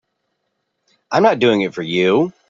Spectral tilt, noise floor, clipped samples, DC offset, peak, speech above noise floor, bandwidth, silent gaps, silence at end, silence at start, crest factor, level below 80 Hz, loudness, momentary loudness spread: -6 dB/octave; -72 dBFS; under 0.1%; under 0.1%; -2 dBFS; 57 dB; 7.6 kHz; none; 0.2 s; 1.1 s; 16 dB; -62 dBFS; -16 LUFS; 7 LU